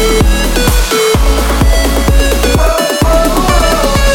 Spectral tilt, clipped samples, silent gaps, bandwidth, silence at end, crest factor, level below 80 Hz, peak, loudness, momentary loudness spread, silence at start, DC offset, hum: -4.5 dB/octave; under 0.1%; none; 18 kHz; 0 s; 8 dB; -12 dBFS; 0 dBFS; -10 LUFS; 1 LU; 0 s; under 0.1%; none